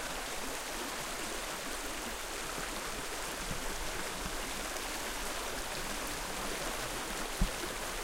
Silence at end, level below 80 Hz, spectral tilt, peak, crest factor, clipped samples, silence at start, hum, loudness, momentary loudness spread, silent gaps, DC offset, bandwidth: 0 s; -46 dBFS; -2 dB/octave; -16 dBFS; 22 dB; under 0.1%; 0 s; none; -37 LUFS; 2 LU; none; under 0.1%; 16.5 kHz